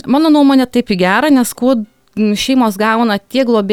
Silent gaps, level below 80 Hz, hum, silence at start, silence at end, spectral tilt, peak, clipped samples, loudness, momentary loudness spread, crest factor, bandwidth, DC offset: none; -48 dBFS; none; 0.05 s; 0 s; -5 dB/octave; 0 dBFS; under 0.1%; -12 LUFS; 6 LU; 10 dB; 17.5 kHz; under 0.1%